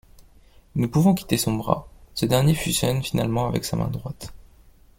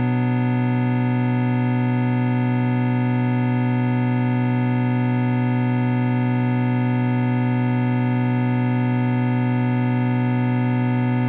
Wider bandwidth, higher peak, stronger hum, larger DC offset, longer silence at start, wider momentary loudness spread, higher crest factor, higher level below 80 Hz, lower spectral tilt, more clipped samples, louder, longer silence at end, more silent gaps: first, 17 kHz vs 4.1 kHz; first, -4 dBFS vs -10 dBFS; neither; neither; first, 0.2 s vs 0 s; first, 13 LU vs 0 LU; first, 20 dB vs 10 dB; first, -44 dBFS vs -64 dBFS; second, -5.5 dB/octave vs -8 dB/octave; neither; second, -23 LUFS vs -20 LUFS; first, 0.6 s vs 0 s; neither